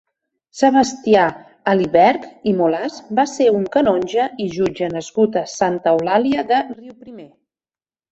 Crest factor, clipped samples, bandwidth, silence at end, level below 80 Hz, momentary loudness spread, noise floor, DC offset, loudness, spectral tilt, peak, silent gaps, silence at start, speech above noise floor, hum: 16 dB; under 0.1%; 8.2 kHz; 0.85 s; -56 dBFS; 8 LU; under -90 dBFS; under 0.1%; -17 LUFS; -5.5 dB/octave; -2 dBFS; none; 0.55 s; over 73 dB; none